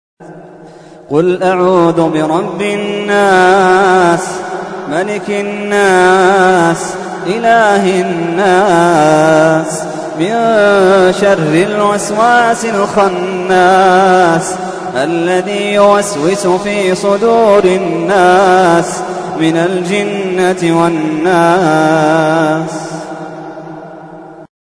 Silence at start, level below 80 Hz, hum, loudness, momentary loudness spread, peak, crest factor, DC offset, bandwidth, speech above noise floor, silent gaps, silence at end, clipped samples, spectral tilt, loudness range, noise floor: 0.2 s; -48 dBFS; none; -10 LUFS; 12 LU; 0 dBFS; 10 dB; under 0.1%; 11 kHz; 21 dB; none; 0.15 s; under 0.1%; -5 dB/octave; 2 LU; -31 dBFS